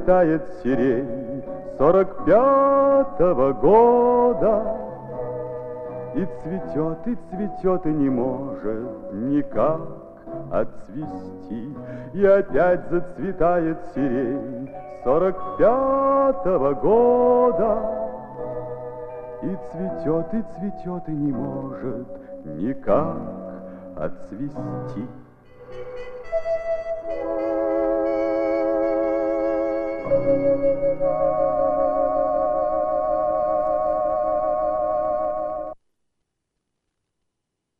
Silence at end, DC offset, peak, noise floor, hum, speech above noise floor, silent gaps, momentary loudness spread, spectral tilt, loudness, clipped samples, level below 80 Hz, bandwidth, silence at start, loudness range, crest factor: 2.05 s; under 0.1%; -4 dBFS; -79 dBFS; none; 59 dB; none; 16 LU; -10 dB/octave; -22 LUFS; under 0.1%; -44 dBFS; 5.4 kHz; 0 s; 10 LU; 18 dB